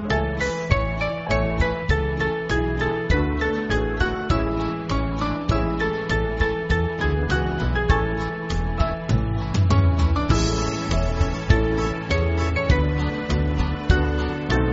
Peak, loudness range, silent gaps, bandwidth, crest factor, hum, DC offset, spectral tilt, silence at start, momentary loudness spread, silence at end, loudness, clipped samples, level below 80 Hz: -4 dBFS; 2 LU; none; 8 kHz; 18 dB; none; under 0.1%; -5.5 dB/octave; 0 s; 5 LU; 0 s; -23 LUFS; under 0.1%; -28 dBFS